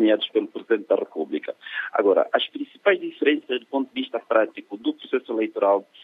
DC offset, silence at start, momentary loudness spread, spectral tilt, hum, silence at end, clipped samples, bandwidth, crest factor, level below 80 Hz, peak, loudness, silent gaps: under 0.1%; 0 s; 9 LU; -6.5 dB/octave; none; 0.2 s; under 0.1%; 4.3 kHz; 20 dB; -82 dBFS; -4 dBFS; -24 LUFS; none